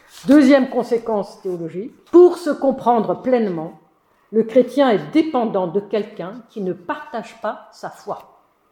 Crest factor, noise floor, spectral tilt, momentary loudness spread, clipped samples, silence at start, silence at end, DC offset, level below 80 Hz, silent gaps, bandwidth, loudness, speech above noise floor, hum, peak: 18 dB; -58 dBFS; -6.5 dB/octave; 20 LU; under 0.1%; 0.15 s; 0.5 s; under 0.1%; -62 dBFS; none; 12 kHz; -18 LUFS; 40 dB; none; -2 dBFS